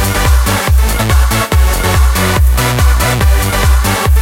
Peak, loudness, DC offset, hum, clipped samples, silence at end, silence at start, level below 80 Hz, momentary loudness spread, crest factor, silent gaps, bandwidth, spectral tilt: 0 dBFS; -11 LUFS; under 0.1%; none; under 0.1%; 0 s; 0 s; -12 dBFS; 1 LU; 10 dB; none; 17 kHz; -4.5 dB/octave